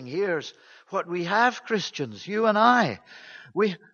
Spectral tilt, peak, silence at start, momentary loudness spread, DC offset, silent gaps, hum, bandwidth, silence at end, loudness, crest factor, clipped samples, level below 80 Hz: -5 dB/octave; -4 dBFS; 0 s; 18 LU; under 0.1%; none; none; 7.2 kHz; 0.15 s; -25 LUFS; 22 dB; under 0.1%; -74 dBFS